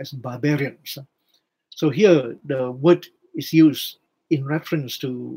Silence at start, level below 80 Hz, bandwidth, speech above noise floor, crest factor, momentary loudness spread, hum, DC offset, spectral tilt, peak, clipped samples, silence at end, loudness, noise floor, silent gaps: 0 s; -72 dBFS; 16 kHz; 48 dB; 18 dB; 17 LU; none; under 0.1%; -6.5 dB/octave; -2 dBFS; under 0.1%; 0 s; -21 LUFS; -68 dBFS; none